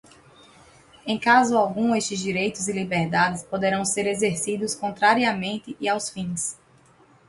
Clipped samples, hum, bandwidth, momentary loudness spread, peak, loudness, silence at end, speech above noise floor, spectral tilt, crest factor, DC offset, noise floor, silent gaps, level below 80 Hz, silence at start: under 0.1%; none; 11.5 kHz; 10 LU; -4 dBFS; -23 LUFS; 0.75 s; 33 dB; -3.5 dB/octave; 20 dB; under 0.1%; -56 dBFS; none; -60 dBFS; 1.05 s